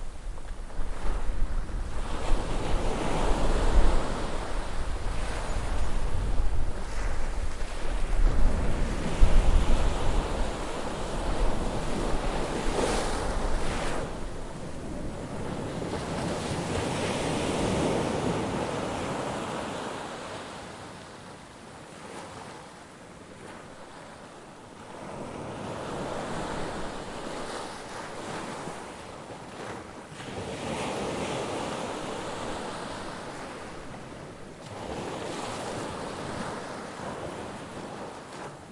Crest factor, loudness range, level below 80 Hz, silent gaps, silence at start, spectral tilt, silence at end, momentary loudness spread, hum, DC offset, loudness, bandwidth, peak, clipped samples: 20 dB; 10 LU; -32 dBFS; none; 0 s; -5 dB/octave; 0 s; 14 LU; none; under 0.1%; -33 LUFS; 11.5 kHz; -6 dBFS; under 0.1%